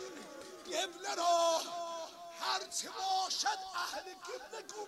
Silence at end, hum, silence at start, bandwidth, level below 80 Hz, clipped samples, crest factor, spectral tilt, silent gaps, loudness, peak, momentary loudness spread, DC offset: 0 s; none; 0 s; 16 kHz; -80 dBFS; under 0.1%; 16 dB; 0.5 dB/octave; none; -36 LUFS; -20 dBFS; 16 LU; under 0.1%